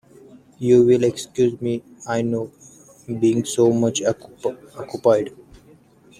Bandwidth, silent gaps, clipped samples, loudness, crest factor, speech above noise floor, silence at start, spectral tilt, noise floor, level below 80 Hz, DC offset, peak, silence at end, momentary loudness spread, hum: 13.5 kHz; none; under 0.1%; -20 LUFS; 18 dB; 32 dB; 0.6 s; -6 dB/octave; -51 dBFS; -58 dBFS; under 0.1%; -2 dBFS; 0.9 s; 14 LU; none